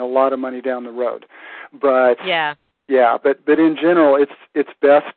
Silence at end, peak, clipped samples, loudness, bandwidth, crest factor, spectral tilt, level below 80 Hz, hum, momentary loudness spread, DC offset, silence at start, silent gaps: 0.05 s; 0 dBFS; under 0.1%; -17 LUFS; 4.4 kHz; 16 dB; -9.5 dB/octave; -66 dBFS; none; 13 LU; under 0.1%; 0 s; none